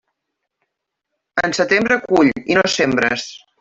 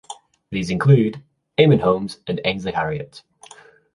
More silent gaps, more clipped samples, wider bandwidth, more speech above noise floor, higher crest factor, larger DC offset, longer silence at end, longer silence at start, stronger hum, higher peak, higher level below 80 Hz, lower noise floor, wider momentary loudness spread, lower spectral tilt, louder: neither; neither; second, 8 kHz vs 11 kHz; first, 61 dB vs 29 dB; about the same, 16 dB vs 18 dB; neither; second, 0.25 s vs 0.75 s; first, 1.35 s vs 0.1 s; neither; about the same, -2 dBFS vs -2 dBFS; about the same, -54 dBFS vs -50 dBFS; first, -78 dBFS vs -47 dBFS; second, 9 LU vs 23 LU; second, -4 dB/octave vs -7 dB/octave; first, -16 LUFS vs -19 LUFS